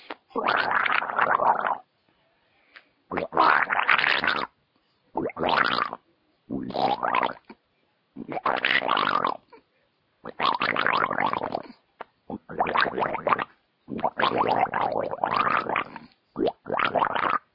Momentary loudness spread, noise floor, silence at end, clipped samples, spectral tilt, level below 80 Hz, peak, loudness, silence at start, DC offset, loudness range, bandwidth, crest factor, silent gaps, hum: 17 LU; -70 dBFS; 0.15 s; under 0.1%; -6 dB/octave; -64 dBFS; -2 dBFS; -25 LUFS; 0.1 s; under 0.1%; 4 LU; 5.8 kHz; 24 dB; none; none